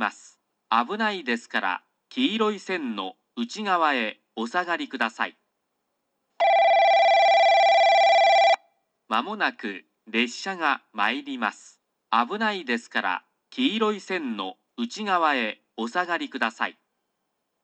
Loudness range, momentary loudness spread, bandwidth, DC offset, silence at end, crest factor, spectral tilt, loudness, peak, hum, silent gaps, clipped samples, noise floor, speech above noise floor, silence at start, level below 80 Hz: 8 LU; 15 LU; 8.8 kHz; under 0.1%; 0.95 s; 18 dB; -3.5 dB/octave; -23 LUFS; -6 dBFS; none; none; under 0.1%; -77 dBFS; 51 dB; 0 s; -86 dBFS